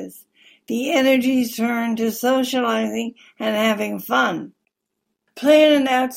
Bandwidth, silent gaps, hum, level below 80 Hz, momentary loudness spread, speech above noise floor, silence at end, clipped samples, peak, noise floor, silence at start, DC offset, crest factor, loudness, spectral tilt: 16.5 kHz; none; none; -68 dBFS; 13 LU; 59 dB; 0 s; under 0.1%; -2 dBFS; -77 dBFS; 0 s; under 0.1%; 18 dB; -19 LUFS; -4 dB/octave